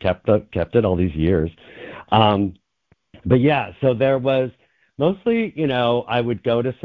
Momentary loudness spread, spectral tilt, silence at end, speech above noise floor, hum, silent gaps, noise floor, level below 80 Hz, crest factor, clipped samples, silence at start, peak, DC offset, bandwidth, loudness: 11 LU; -9.5 dB/octave; 0.1 s; 44 dB; none; none; -63 dBFS; -40 dBFS; 18 dB; under 0.1%; 0 s; -2 dBFS; under 0.1%; 5 kHz; -20 LUFS